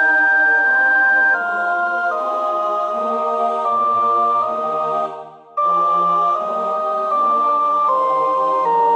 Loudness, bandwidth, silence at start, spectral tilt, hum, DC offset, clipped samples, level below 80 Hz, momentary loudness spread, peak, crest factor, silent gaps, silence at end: -16 LUFS; 8.8 kHz; 0 s; -4.5 dB/octave; none; under 0.1%; under 0.1%; -70 dBFS; 7 LU; -6 dBFS; 10 dB; none; 0 s